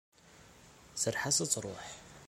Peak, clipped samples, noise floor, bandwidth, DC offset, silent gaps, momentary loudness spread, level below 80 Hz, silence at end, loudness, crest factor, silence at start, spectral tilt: -14 dBFS; under 0.1%; -59 dBFS; 16.5 kHz; under 0.1%; none; 16 LU; -66 dBFS; 0 s; -32 LUFS; 24 dB; 0.25 s; -2 dB/octave